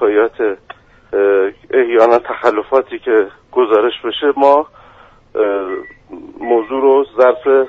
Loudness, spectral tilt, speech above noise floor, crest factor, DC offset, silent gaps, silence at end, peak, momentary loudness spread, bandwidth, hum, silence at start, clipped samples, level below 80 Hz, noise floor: -14 LUFS; -5.5 dB/octave; 31 dB; 14 dB; under 0.1%; none; 0 s; 0 dBFS; 15 LU; 5.6 kHz; none; 0 s; under 0.1%; -54 dBFS; -44 dBFS